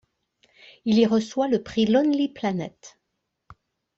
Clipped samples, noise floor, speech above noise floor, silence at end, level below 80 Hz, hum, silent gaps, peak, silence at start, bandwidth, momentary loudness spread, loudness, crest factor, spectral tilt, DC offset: under 0.1%; -79 dBFS; 57 dB; 1.1 s; -62 dBFS; none; none; -6 dBFS; 0.85 s; 7.8 kHz; 12 LU; -23 LUFS; 18 dB; -6 dB/octave; under 0.1%